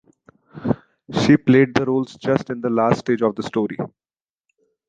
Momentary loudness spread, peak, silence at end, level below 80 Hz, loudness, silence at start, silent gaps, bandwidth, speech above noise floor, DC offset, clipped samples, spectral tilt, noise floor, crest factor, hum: 12 LU; -2 dBFS; 1 s; -54 dBFS; -20 LUFS; 0.55 s; none; 9 kHz; 58 dB; under 0.1%; under 0.1%; -7 dB/octave; -77 dBFS; 18 dB; none